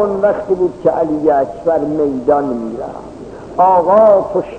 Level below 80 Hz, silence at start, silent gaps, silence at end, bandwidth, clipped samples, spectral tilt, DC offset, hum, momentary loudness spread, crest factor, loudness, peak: -44 dBFS; 0 s; none; 0 s; 8.6 kHz; under 0.1%; -8.5 dB/octave; 0.1%; none; 17 LU; 12 dB; -13 LUFS; 0 dBFS